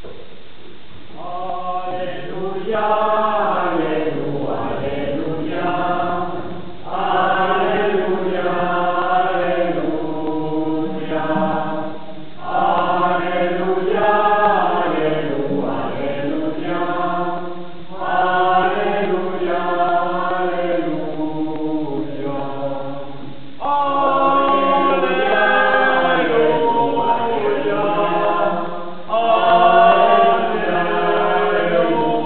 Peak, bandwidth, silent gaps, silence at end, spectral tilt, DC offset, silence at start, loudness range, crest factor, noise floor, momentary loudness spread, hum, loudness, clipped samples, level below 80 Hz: 0 dBFS; 4.5 kHz; none; 0 s; -3.5 dB/octave; 5%; 0.05 s; 7 LU; 18 dB; -42 dBFS; 12 LU; none; -18 LUFS; under 0.1%; -52 dBFS